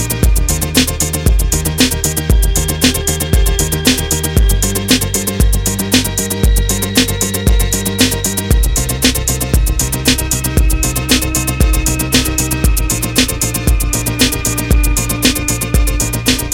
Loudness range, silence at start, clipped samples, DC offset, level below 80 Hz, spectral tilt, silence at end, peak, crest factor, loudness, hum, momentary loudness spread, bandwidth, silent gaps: 1 LU; 0 s; under 0.1%; under 0.1%; -16 dBFS; -3.5 dB/octave; 0 s; 0 dBFS; 12 dB; -13 LUFS; none; 3 LU; 17 kHz; none